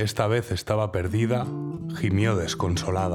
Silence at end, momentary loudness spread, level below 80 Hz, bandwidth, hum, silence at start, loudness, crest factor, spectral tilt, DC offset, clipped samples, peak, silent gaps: 0 s; 6 LU; -52 dBFS; 16.5 kHz; none; 0 s; -26 LUFS; 16 dB; -6 dB/octave; under 0.1%; under 0.1%; -8 dBFS; none